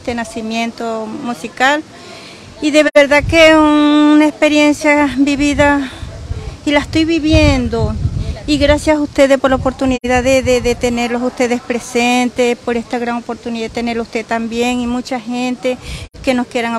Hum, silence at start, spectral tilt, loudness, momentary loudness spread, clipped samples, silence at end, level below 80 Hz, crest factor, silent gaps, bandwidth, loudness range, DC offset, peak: none; 0 s; -5 dB/octave; -13 LUFS; 13 LU; under 0.1%; 0 s; -30 dBFS; 14 dB; none; 13 kHz; 8 LU; under 0.1%; 0 dBFS